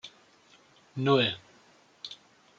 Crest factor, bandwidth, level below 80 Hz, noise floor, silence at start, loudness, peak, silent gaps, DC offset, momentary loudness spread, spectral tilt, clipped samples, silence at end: 22 dB; 7.6 kHz; -74 dBFS; -60 dBFS; 0.05 s; -27 LUFS; -10 dBFS; none; under 0.1%; 23 LU; -6 dB/octave; under 0.1%; 0.45 s